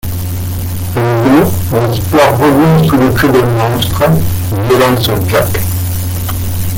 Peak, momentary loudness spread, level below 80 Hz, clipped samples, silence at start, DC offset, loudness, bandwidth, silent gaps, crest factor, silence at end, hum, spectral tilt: 0 dBFS; 9 LU; -28 dBFS; under 0.1%; 0.05 s; under 0.1%; -11 LUFS; 17 kHz; none; 10 dB; 0 s; none; -6 dB/octave